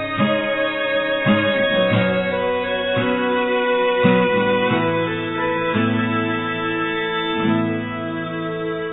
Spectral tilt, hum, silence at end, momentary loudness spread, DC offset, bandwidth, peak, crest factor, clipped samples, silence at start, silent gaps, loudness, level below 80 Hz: -9.5 dB/octave; none; 0 s; 7 LU; under 0.1%; 4.1 kHz; -4 dBFS; 16 dB; under 0.1%; 0 s; none; -19 LUFS; -54 dBFS